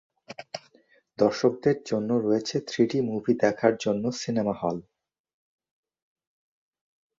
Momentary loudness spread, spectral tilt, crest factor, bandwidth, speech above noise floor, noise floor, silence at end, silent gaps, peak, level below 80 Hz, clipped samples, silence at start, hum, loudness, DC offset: 16 LU; -6 dB/octave; 22 dB; 7.8 kHz; 37 dB; -62 dBFS; 2.4 s; none; -6 dBFS; -66 dBFS; under 0.1%; 0.3 s; none; -26 LUFS; under 0.1%